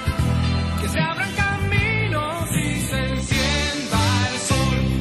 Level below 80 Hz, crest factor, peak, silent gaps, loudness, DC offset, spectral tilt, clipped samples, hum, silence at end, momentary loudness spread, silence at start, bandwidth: -30 dBFS; 14 dB; -8 dBFS; none; -21 LUFS; under 0.1%; -4.5 dB/octave; under 0.1%; none; 0 s; 3 LU; 0 s; 13 kHz